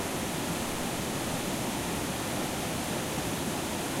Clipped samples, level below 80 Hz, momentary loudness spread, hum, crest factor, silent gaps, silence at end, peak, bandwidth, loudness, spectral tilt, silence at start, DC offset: under 0.1%; -50 dBFS; 0 LU; none; 12 dB; none; 0 s; -20 dBFS; 16 kHz; -32 LUFS; -3.5 dB/octave; 0 s; under 0.1%